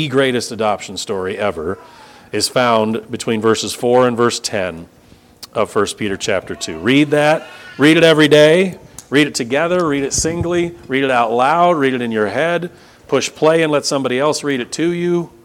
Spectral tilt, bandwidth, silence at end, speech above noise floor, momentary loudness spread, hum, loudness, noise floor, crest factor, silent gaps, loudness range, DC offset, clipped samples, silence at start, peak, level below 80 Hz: -4 dB/octave; 17.5 kHz; 0.15 s; 30 dB; 10 LU; none; -15 LUFS; -45 dBFS; 16 dB; none; 5 LU; under 0.1%; under 0.1%; 0 s; 0 dBFS; -48 dBFS